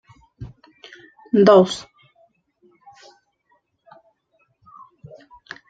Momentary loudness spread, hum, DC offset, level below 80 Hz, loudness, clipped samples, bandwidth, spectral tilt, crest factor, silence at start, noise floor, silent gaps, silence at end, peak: 28 LU; none; under 0.1%; -60 dBFS; -16 LUFS; under 0.1%; 9.2 kHz; -6.5 dB/octave; 22 dB; 0.4 s; -66 dBFS; none; 3.9 s; -2 dBFS